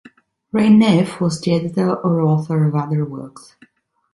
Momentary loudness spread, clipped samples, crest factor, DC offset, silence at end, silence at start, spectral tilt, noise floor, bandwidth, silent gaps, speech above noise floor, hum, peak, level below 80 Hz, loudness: 12 LU; under 0.1%; 14 dB; under 0.1%; 0.75 s; 0.55 s; -7.5 dB/octave; -44 dBFS; 11.5 kHz; none; 28 dB; none; -2 dBFS; -58 dBFS; -17 LUFS